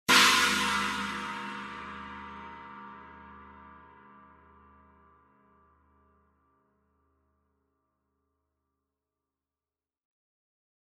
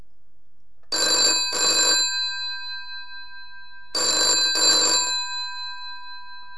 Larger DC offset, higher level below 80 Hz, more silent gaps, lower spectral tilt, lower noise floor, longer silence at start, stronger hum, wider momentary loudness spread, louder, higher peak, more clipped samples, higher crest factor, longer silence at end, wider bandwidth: second, under 0.1% vs 2%; about the same, -62 dBFS vs -62 dBFS; neither; first, -1 dB/octave vs 1.5 dB/octave; first, under -90 dBFS vs -67 dBFS; second, 0.1 s vs 0.9 s; neither; first, 29 LU vs 21 LU; second, -26 LUFS vs -19 LUFS; about the same, -8 dBFS vs -8 dBFS; neither; first, 28 dB vs 18 dB; first, 7.1 s vs 0 s; first, 13.5 kHz vs 11 kHz